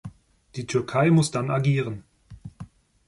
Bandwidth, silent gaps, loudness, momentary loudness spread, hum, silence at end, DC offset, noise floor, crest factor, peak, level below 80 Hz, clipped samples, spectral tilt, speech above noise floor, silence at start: 11.5 kHz; none; -23 LUFS; 25 LU; none; 0.45 s; under 0.1%; -45 dBFS; 16 dB; -8 dBFS; -56 dBFS; under 0.1%; -6.5 dB/octave; 23 dB; 0.05 s